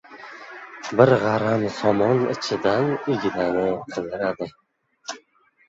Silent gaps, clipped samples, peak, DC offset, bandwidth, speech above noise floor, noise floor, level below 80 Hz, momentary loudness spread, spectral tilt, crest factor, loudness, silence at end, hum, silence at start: none; under 0.1%; -2 dBFS; under 0.1%; 7.8 kHz; 38 dB; -59 dBFS; -58 dBFS; 21 LU; -6 dB/octave; 20 dB; -22 LUFS; 0.5 s; none; 0.1 s